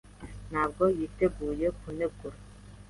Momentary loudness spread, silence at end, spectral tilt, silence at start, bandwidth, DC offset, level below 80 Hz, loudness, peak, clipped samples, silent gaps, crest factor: 20 LU; 0 s; -7.5 dB/octave; 0.05 s; 11.5 kHz; under 0.1%; -48 dBFS; -30 LUFS; -14 dBFS; under 0.1%; none; 18 dB